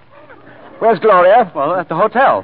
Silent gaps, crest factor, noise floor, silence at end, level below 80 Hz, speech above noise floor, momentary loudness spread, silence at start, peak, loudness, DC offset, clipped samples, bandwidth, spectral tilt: none; 12 dB; -41 dBFS; 0 s; -62 dBFS; 29 dB; 8 LU; 0.8 s; -2 dBFS; -12 LUFS; 0.5%; under 0.1%; 4.8 kHz; -11 dB/octave